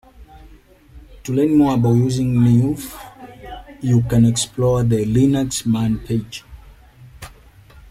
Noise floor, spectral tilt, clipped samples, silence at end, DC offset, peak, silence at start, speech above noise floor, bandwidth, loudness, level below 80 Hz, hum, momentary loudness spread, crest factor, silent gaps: -46 dBFS; -6.5 dB/octave; under 0.1%; 0.1 s; under 0.1%; -4 dBFS; 0.2 s; 30 dB; 14.5 kHz; -17 LUFS; -40 dBFS; none; 22 LU; 14 dB; none